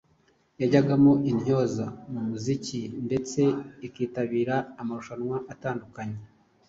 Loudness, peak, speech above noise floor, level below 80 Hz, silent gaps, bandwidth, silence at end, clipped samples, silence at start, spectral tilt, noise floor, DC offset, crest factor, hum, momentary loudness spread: -27 LUFS; -8 dBFS; 39 dB; -62 dBFS; none; 7.8 kHz; 0.45 s; under 0.1%; 0.6 s; -7 dB/octave; -65 dBFS; under 0.1%; 20 dB; none; 15 LU